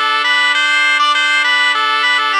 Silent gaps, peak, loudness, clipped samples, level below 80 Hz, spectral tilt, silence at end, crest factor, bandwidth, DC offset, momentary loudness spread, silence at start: none; 0 dBFS; -11 LUFS; under 0.1%; under -90 dBFS; 4.5 dB/octave; 0 s; 12 dB; 15.5 kHz; under 0.1%; 1 LU; 0 s